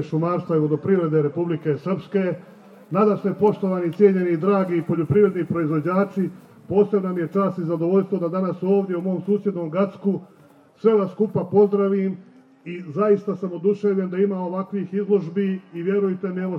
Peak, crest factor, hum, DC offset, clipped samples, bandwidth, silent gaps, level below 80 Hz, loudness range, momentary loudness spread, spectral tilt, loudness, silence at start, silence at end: -4 dBFS; 18 dB; none; under 0.1%; under 0.1%; 5.8 kHz; none; -66 dBFS; 3 LU; 8 LU; -10 dB/octave; -22 LUFS; 0 s; 0 s